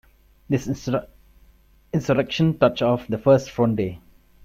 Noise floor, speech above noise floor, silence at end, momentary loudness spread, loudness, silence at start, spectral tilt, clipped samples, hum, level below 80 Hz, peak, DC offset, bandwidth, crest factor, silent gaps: -55 dBFS; 34 dB; 0.5 s; 9 LU; -22 LUFS; 0.5 s; -7 dB/octave; under 0.1%; none; -50 dBFS; -2 dBFS; under 0.1%; 14 kHz; 20 dB; none